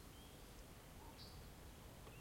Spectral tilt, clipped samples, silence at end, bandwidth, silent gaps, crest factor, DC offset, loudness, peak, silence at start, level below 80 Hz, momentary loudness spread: -4 dB/octave; under 0.1%; 0 s; 16.5 kHz; none; 14 dB; under 0.1%; -59 LUFS; -44 dBFS; 0 s; -64 dBFS; 2 LU